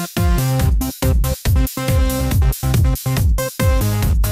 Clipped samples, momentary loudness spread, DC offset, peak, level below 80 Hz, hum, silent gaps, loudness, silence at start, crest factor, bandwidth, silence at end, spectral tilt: under 0.1%; 2 LU; under 0.1%; -4 dBFS; -20 dBFS; none; none; -18 LUFS; 0 s; 12 dB; 16 kHz; 0 s; -5.5 dB/octave